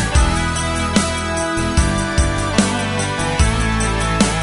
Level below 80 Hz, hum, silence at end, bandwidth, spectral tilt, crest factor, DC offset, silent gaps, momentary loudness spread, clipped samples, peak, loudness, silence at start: -22 dBFS; none; 0 s; 11.5 kHz; -4.5 dB/octave; 16 dB; under 0.1%; none; 3 LU; under 0.1%; 0 dBFS; -18 LUFS; 0 s